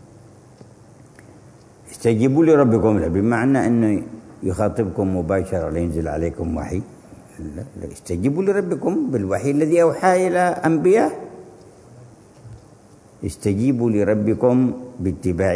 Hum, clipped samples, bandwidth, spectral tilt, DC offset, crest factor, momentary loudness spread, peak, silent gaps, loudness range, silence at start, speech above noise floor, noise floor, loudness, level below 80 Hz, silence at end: none; under 0.1%; 11 kHz; -7.5 dB/octave; under 0.1%; 18 dB; 16 LU; -2 dBFS; none; 6 LU; 1.85 s; 29 dB; -48 dBFS; -19 LUFS; -44 dBFS; 0 s